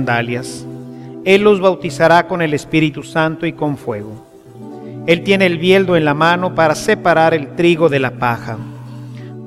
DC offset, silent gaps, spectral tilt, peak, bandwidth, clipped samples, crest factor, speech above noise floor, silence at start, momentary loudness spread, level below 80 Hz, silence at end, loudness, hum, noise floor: under 0.1%; none; -6 dB/octave; 0 dBFS; 14.5 kHz; under 0.1%; 16 dB; 20 dB; 0 s; 19 LU; -50 dBFS; 0 s; -14 LUFS; none; -34 dBFS